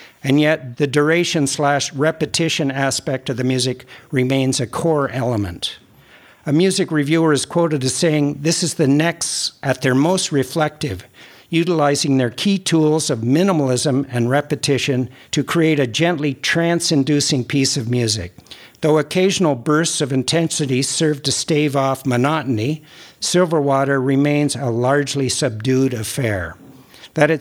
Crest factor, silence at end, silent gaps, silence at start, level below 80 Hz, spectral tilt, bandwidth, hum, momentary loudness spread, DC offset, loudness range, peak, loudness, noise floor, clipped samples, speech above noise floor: 16 dB; 0 s; none; 0 s; -58 dBFS; -4.5 dB/octave; 17 kHz; none; 6 LU; under 0.1%; 2 LU; -2 dBFS; -18 LUFS; -47 dBFS; under 0.1%; 29 dB